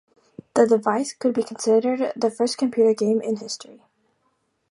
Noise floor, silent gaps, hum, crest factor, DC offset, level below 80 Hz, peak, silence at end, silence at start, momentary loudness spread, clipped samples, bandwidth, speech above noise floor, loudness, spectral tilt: -70 dBFS; none; none; 20 dB; under 0.1%; -72 dBFS; -4 dBFS; 1.1 s; 0.55 s; 9 LU; under 0.1%; 11.5 kHz; 49 dB; -22 LUFS; -4.5 dB/octave